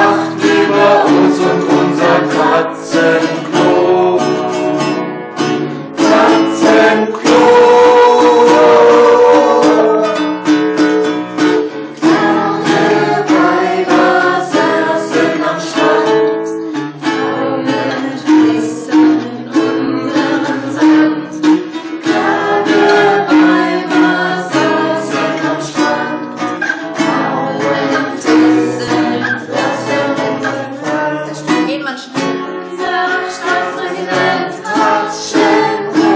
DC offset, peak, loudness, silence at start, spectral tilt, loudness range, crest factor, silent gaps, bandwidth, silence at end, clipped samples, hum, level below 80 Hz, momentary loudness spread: under 0.1%; 0 dBFS; -12 LUFS; 0 s; -5 dB/octave; 8 LU; 12 dB; none; 9.2 kHz; 0 s; under 0.1%; none; -62 dBFS; 10 LU